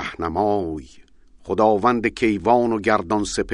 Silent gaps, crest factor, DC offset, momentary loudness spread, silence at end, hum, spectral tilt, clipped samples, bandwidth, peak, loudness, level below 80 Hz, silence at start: none; 18 dB; under 0.1%; 9 LU; 0 s; none; -5.5 dB/octave; under 0.1%; 10.5 kHz; -2 dBFS; -20 LUFS; -46 dBFS; 0 s